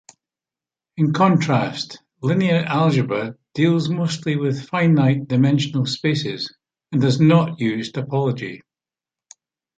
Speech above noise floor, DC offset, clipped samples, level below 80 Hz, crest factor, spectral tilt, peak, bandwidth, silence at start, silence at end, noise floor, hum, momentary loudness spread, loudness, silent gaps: over 71 dB; under 0.1%; under 0.1%; -60 dBFS; 18 dB; -7 dB/octave; -2 dBFS; 9 kHz; 0.95 s; 1.2 s; under -90 dBFS; none; 11 LU; -20 LUFS; none